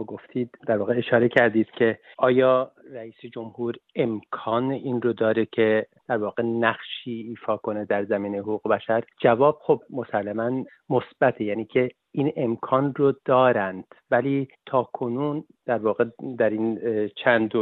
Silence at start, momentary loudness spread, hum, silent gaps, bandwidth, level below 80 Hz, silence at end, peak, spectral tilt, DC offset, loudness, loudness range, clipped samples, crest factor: 0 s; 12 LU; none; none; 4.3 kHz; -68 dBFS; 0 s; -4 dBFS; -9 dB/octave; under 0.1%; -24 LUFS; 3 LU; under 0.1%; 20 dB